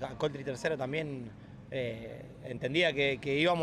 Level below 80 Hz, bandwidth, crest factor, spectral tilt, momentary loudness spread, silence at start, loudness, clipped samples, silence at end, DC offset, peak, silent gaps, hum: -62 dBFS; 13 kHz; 18 dB; -5.5 dB/octave; 17 LU; 0 s; -32 LUFS; under 0.1%; 0 s; under 0.1%; -16 dBFS; none; none